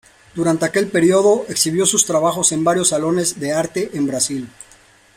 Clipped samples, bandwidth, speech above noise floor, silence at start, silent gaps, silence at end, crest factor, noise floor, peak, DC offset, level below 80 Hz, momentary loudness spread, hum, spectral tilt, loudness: under 0.1%; 16 kHz; 32 dB; 0.35 s; none; 0.65 s; 18 dB; -49 dBFS; 0 dBFS; under 0.1%; -58 dBFS; 7 LU; none; -3.5 dB/octave; -17 LUFS